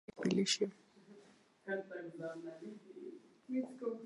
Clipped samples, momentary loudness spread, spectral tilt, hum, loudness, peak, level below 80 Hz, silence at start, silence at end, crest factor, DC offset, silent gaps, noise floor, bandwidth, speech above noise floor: under 0.1%; 20 LU; -4 dB/octave; none; -40 LUFS; -18 dBFS; -84 dBFS; 0.15 s; 0 s; 24 dB; under 0.1%; none; -65 dBFS; 11 kHz; 25 dB